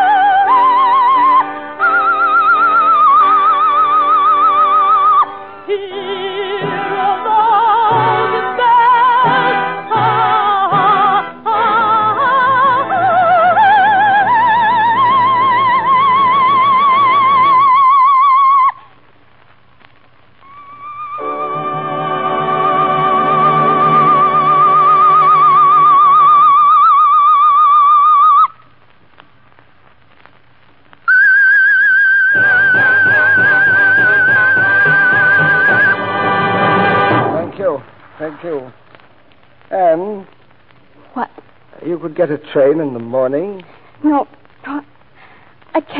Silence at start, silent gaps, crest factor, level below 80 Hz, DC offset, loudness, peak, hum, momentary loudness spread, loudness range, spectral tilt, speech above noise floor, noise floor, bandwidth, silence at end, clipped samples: 0 s; none; 10 dB; -62 dBFS; 0.5%; -10 LUFS; -2 dBFS; none; 13 LU; 11 LU; -10 dB/octave; 34 dB; -49 dBFS; 5.2 kHz; 0 s; under 0.1%